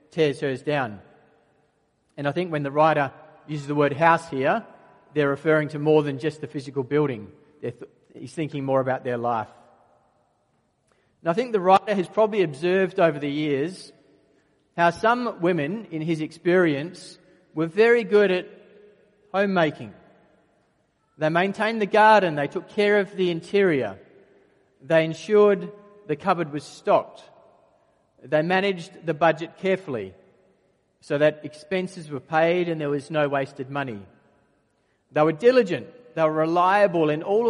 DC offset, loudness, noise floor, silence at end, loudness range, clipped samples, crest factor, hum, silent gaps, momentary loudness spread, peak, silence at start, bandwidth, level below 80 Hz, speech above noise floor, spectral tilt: under 0.1%; -23 LUFS; -68 dBFS; 0 s; 5 LU; under 0.1%; 20 dB; none; none; 14 LU; -4 dBFS; 0.15 s; 11.5 kHz; -70 dBFS; 46 dB; -6.5 dB/octave